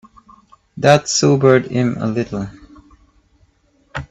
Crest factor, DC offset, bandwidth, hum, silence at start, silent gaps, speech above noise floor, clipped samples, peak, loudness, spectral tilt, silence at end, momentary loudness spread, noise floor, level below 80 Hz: 18 dB; under 0.1%; 9.6 kHz; none; 0.75 s; none; 43 dB; under 0.1%; 0 dBFS; -15 LUFS; -5 dB/octave; 0.05 s; 18 LU; -58 dBFS; -48 dBFS